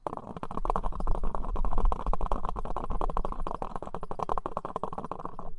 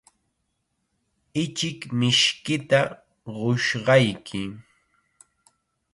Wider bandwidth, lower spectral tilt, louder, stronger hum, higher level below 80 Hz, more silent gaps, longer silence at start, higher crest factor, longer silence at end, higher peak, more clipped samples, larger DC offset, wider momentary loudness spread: second, 4.1 kHz vs 11.5 kHz; first, -8 dB/octave vs -4.5 dB/octave; second, -36 LUFS vs -23 LUFS; neither; first, -32 dBFS vs -62 dBFS; neither; second, 0.05 s vs 1.35 s; about the same, 18 dB vs 20 dB; second, 0 s vs 1.35 s; second, -10 dBFS vs -4 dBFS; neither; neither; second, 6 LU vs 14 LU